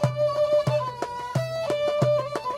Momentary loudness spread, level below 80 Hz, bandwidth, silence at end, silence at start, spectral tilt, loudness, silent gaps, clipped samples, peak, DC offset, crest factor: 7 LU; -60 dBFS; 14 kHz; 0 s; 0 s; -6.5 dB/octave; -25 LUFS; none; under 0.1%; -8 dBFS; under 0.1%; 16 dB